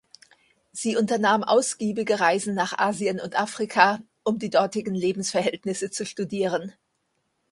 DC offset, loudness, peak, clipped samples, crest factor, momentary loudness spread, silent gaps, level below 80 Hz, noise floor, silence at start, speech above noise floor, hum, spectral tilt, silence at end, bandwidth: under 0.1%; -24 LUFS; 0 dBFS; under 0.1%; 24 dB; 10 LU; none; -70 dBFS; -74 dBFS; 0.75 s; 50 dB; none; -4 dB/octave; 0.8 s; 11.5 kHz